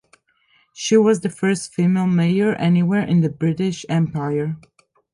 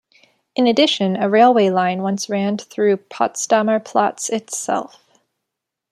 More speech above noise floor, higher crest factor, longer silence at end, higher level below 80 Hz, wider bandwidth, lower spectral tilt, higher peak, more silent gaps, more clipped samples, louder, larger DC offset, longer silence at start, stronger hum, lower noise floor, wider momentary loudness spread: second, 42 dB vs 64 dB; about the same, 16 dB vs 16 dB; second, 0.55 s vs 1.05 s; first, -58 dBFS vs -70 dBFS; second, 11.5 kHz vs 13.5 kHz; first, -6.5 dB/octave vs -4 dB/octave; about the same, -4 dBFS vs -2 dBFS; neither; neither; about the same, -19 LUFS vs -18 LUFS; neither; first, 0.75 s vs 0.55 s; neither; second, -61 dBFS vs -81 dBFS; second, 7 LU vs 10 LU